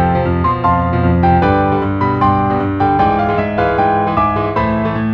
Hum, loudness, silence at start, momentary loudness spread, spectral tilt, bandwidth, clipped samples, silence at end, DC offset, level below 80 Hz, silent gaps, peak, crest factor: none; -14 LUFS; 0 s; 4 LU; -9.5 dB/octave; 5.8 kHz; under 0.1%; 0 s; under 0.1%; -30 dBFS; none; 0 dBFS; 14 dB